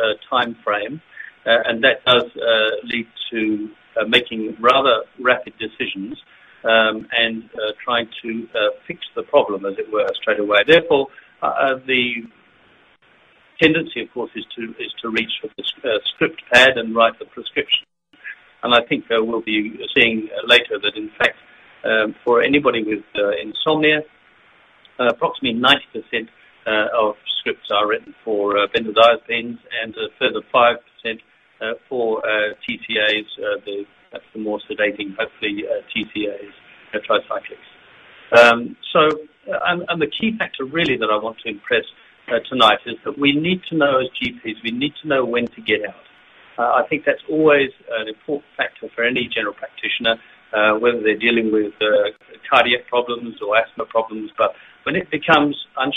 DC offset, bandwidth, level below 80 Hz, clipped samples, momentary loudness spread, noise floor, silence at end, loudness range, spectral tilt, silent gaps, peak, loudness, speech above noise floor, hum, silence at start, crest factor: under 0.1%; 12.5 kHz; -58 dBFS; under 0.1%; 13 LU; -54 dBFS; 0 s; 5 LU; -4.5 dB/octave; none; 0 dBFS; -19 LUFS; 35 dB; none; 0 s; 20 dB